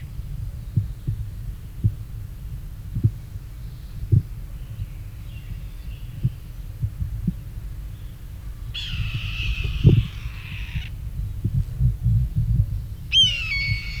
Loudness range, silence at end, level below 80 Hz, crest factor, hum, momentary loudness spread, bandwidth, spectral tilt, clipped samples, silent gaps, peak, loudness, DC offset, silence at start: 10 LU; 0 s; -32 dBFS; 24 dB; none; 18 LU; 15.5 kHz; -5 dB/octave; under 0.1%; none; -2 dBFS; -24 LUFS; under 0.1%; 0 s